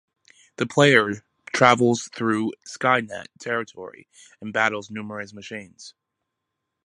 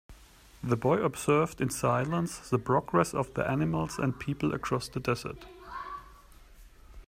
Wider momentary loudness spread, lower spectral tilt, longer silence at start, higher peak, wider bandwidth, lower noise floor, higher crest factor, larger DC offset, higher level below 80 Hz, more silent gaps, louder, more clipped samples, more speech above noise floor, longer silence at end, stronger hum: first, 20 LU vs 14 LU; second, -4.5 dB/octave vs -6 dB/octave; first, 0.6 s vs 0.1 s; first, 0 dBFS vs -12 dBFS; second, 11.5 kHz vs 16 kHz; first, -81 dBFS vs -55 dBFS; about the same, 24 dB vs 20 dB; neither; second, -66 dBFS vs -54 dBFS; neither; first, -21 LUFS vs -30 LUFS; neither; first, 58 dB vs 26 dB; first, 0.95 s vs 0.05 s; neither